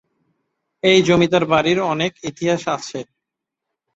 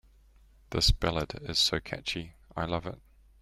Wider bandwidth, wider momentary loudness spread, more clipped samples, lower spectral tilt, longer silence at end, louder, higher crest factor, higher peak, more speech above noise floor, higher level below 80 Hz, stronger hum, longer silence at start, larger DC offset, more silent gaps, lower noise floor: second, 8 kHz vs 15.5 kHz; second, 11 LU vs 14 LU; neither; first, -5 dB/octave vs -3.5 dB/octave; first, 0.95 s vs 0.45 s; first, -17 LUFS vs -30 LUFS; about the same, 18 dB vs 22 dB; first, -2 dBFS vs -10 dBFS; first, 65 dB vs 29 dB; second, -54 dBFS vs -40 dBFS; neither; first, 0.85 s vs 0.7 s; neither; neither; first, -82 dBFS vs -59 dBFS